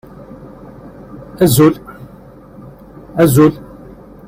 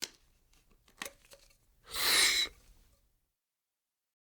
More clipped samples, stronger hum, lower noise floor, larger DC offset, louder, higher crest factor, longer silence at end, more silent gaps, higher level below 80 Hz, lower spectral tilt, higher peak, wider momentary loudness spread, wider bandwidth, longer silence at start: neither; neither; second, -38 dBFS vs -90 dBFS; neither; first, -12 LUFS vs -28 LUFS; second, 16 dB vs 24 dB; second, 0.65 s vs 1.75 s; neither; first, -42 dBFS vs -64 dBFS; first, -6.5 dB/octave vs 1.5 dB/octave; first, 0 dBFS vs -14 dBFS; first, 26 LU vs 21 LU; second, 16.5 kHz vs over 20 kHz; first, 0.4 s vs 0 s